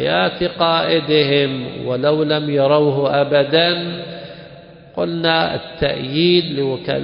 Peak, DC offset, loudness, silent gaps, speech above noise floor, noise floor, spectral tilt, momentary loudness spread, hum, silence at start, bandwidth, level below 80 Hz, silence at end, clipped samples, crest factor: 0 dBFS; under 0.1%; -17 LUFS; none; 23 dB; -40 dBFS; -11 dB/octave; 11 LU; none; 0 s; 5.4 kHz; -48 dBFS; 0 s; under 0.1%; 16 dB